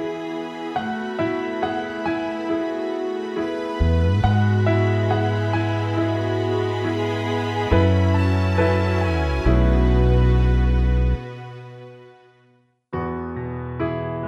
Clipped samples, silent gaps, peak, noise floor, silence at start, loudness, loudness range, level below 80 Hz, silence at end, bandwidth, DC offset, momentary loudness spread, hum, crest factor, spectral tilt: under 0.1%; none; -4 dBFS; -59 dBFS; 0 s; -21 LUFS; 6 LU; -26 dBFS; 0 s; 8 kHz; under 0.1%; 11 LU; none; 16 dB; -8 dB/octave